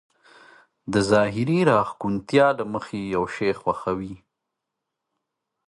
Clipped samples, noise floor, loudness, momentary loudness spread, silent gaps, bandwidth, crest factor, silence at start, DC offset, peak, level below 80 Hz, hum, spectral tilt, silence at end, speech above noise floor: under 0.1%; -83 dBFS; -23 LUFS; 10 LU; none; 11.5 kHz; 20 dB; 0.85 s; under 0.1%; -4 dBFS; -56 dBFS; none; -6.5 dB/octave; 1.5 s; 61 dB